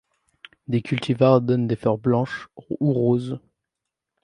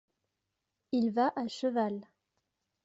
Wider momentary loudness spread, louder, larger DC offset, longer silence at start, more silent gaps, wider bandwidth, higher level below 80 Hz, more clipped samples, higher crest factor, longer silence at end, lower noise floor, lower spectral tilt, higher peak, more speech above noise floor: first, 16 LU vs 6 LU; first, -22 LUFS vs -32 LUFS; neither; second, 0.7 s vs 0.9 s; neither; first, 10 kHz vs 8 kHz; first, -60 dBFS vs -80 dBFS; neither; about the same, 20 dB vs 16 dB; about the same, 0.85 s vs 0.8 s; about the same, -84 dBFS vs -85 dBFS; first, -8.5 dB/octave vs -6 dB/octave; first, -2 dBFS vs -18 dBFS; first, 63 dB vs 54 dB